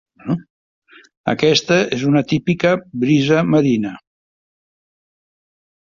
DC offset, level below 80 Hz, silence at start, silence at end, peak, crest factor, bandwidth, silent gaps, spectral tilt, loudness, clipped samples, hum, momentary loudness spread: under 0.1%; -54 dBFS; 0.25 s; 1.95 s; -2 dBFS; 18 dB; 7.4 kHz; 0.50-0.82 s, 1.17-1.24 s; -6 dB/octave; -17 LUFS; under 0.1%; none; 10 LU